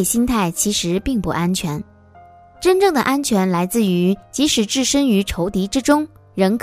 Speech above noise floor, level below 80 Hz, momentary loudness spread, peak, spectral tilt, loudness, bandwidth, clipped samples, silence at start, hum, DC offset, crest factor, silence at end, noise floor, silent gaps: 28 dB; -40 dBFS; 6 LU; -2 dBFS; -4.5 dB/octave; -18 LUFS; 16 kHz; under 0.1%; 0 s; none; under 0.1%; 16 dB; 0.05 s; -45 dBFS; none